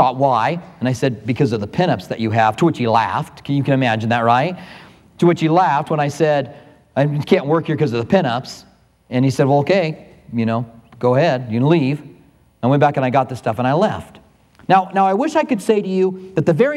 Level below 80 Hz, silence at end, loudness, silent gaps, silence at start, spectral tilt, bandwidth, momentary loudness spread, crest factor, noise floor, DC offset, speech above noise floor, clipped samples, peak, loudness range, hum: -56 dBFS; 0 s; -17 LUFS; none; 0 s; -7 dB/octave; 13 kHz; 9 LU; 16 dB; -50 dBFS; under 0.1%; 33 dB; under 0.1%; 0 dBFS; 2 LU; none